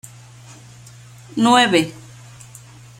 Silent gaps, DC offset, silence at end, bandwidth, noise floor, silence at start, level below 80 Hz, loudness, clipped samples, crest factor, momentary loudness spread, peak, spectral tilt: none; under 0.1%; 1.05 s; 16.5 kHz; -42 dBFS; 1.35 s; -60 dBFS; -16 LUFS; under 0.1%; 20 dB; 27 LU; -2 dBFS; -4 dB/octave